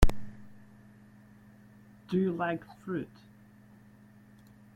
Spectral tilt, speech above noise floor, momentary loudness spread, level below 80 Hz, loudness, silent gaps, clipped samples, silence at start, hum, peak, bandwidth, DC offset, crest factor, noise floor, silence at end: -7 dB/octave; 24 dB; 26 LU; -36 dBFS; -34 LUFS; none; under 0.1%; 0 s; none; -4 dBFS; 15 kHz; under 0.1%; 28 dB; -56 dBFS; 1.7 s